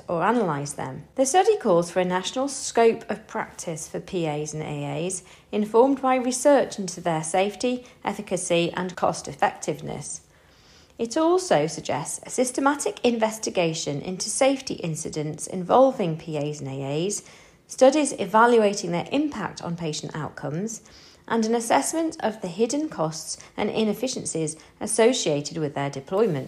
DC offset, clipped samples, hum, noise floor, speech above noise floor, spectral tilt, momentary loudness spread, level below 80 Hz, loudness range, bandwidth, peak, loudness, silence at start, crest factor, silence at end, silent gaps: under 0.1%; under 0.1%; none; -54 dBFS; 30 dB; -4.5 dB/octave; 12 LU; -62 dBFS; 4 LU; 14 kHz; -4 dBFS; -24 LUFS; 0.1 s; 20 dB; 0 s; none